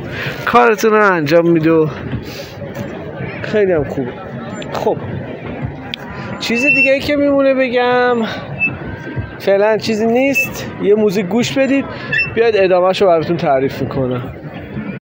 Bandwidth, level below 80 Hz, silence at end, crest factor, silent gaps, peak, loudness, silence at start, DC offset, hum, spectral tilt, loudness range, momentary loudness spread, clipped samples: 16.5 kHz; -42 dBFS; 0.15 s; 16 dB; none; 0 dBFS; -14 LUFS; 0 s; under 0.1%; none; -6 dB/octave; 6 LU; 15 LU; under 0.1%